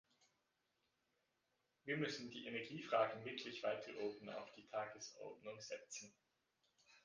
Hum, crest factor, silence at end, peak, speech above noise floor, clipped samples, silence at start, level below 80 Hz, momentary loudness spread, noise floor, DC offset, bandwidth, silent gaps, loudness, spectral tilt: none; 22 dB; 0.05 s; -26 dBFS; 40 dB; under 0.1%; 1.85 s; -90 dBFS; 13 LU; -86 dBFS; under 0.1%; 10 kHz; none; -47 LUFS; -4 dB/octave